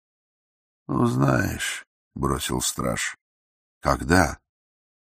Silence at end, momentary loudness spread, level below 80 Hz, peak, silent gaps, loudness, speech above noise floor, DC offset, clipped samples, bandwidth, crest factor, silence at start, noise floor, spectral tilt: 0.65 s; 10 LU; -42 dBFS; -2 dBFS; 1.87-2.11 s, 3.21-3.81 s; -24 LUFS; over 67 dB; under 0.1%; under 0.1%; 15.5 kHz; 24 dB; 0.9 s; under -90 dBFS; -4.5 dB/octave